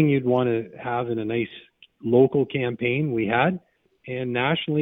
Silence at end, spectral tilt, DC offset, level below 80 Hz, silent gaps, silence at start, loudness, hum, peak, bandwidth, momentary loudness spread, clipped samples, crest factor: 0 s; -10 dB/octave; under 0.1%; -62 dBFS; none; 0 s; -23 LUFS; none; -6 dBFS; 16.5 kHz; 11 LU; under 0.1%; 18 dB